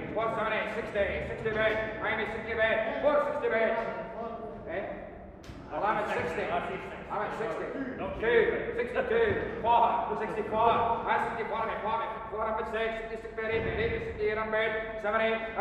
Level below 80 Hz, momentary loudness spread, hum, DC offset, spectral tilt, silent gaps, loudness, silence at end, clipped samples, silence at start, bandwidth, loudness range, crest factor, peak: -52 dBFS; 11 LU; none; under 0.1%; -6.5 dB/octave; none; -30 LUFS; 0 s; under 0.1%; 0 s; 10.5 kHz; 6 LU; 18 dB; -12 dBFS